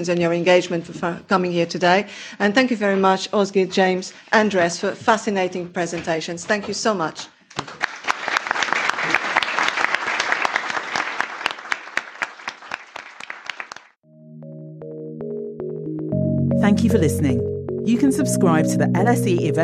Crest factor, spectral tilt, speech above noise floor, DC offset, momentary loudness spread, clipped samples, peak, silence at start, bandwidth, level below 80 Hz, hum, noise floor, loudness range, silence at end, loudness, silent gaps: 20 dB; -5 dB/octave; 30 dB; under 0.1%; 15 LU; under 0.1%; -2 dBFS; 0 s; 14.5 kHz; -56 dBFS; none; -49 dBFS; 12 LU; 0 s; -20 LUFS; 13.97-14.02 s